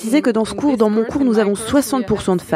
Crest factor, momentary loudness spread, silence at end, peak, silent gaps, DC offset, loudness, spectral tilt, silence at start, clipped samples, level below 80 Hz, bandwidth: 14 dB; 3 LU; 0 s; -2 dBFS; none; under 0.1%; -17 LUFS; -5.5 dB/octave; 0 s; under 0.1%; -44 dBFS; 15.5 kHz